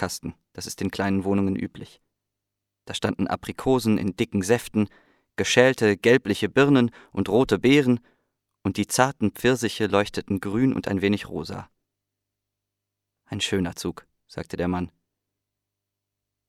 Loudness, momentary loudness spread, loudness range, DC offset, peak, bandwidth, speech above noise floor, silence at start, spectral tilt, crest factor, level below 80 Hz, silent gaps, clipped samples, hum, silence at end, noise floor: -23 LUFS; 16 LU; 10 LU; under 0.1%; -2 dBFS; 16 kHz; 61 dB; 0 s; -5 dB/octave; 22 dB; -54 dBFS; none; under 0.1%; 50 Hz at -50 dBFS; 1.6 s; -84 dBFS